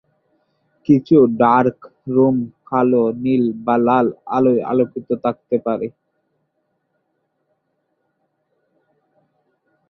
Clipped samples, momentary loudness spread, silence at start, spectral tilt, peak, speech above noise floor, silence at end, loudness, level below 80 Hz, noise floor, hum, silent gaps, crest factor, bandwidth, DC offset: under 0.1%; 10 LU; 0.9 s; -10 dB/octave; -2 dBFS; 54 dB; 4 s; -17 LUFS; -60 dBFS; -70 dBFS; none; none; 18 dB; 6 kHz; under 0.1%